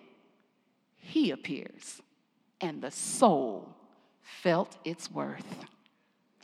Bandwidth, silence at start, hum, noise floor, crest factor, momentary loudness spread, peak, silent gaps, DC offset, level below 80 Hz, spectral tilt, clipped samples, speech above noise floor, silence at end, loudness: 14.5 kHz; 1.05 s; none; -73 dBFS; 26 dB; 22 LU; -8 dBFS; none; under 0.1%; under -90 dBFS; -4.5 dB/octave; under 0.1%; 42 dB; 0.75 s; -31 LUFS